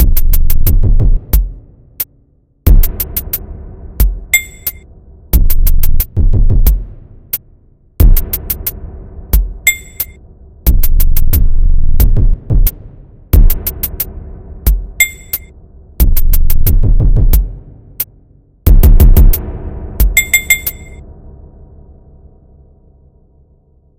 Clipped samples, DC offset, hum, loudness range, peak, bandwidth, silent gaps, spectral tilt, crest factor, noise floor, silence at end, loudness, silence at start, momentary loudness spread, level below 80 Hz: 0.8%; under 0.1%; none; 4 LU; 0 dBFS; 17 kHz; none; -4 dB/octave; 10 dB; -51 dBFS; 0 s; -14 LUFS; 0 s; 11 LU; -10 dBFS